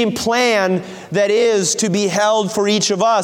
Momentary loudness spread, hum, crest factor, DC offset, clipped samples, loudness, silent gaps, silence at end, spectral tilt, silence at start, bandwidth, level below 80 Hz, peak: 4 LU; none; 12 dB; under 0.1%; under 0.1%; -16 LUFS; none; 0 s; -3.5 dB/octave; 0 s; 17 kHz; -58 dBFS; -4 dBFS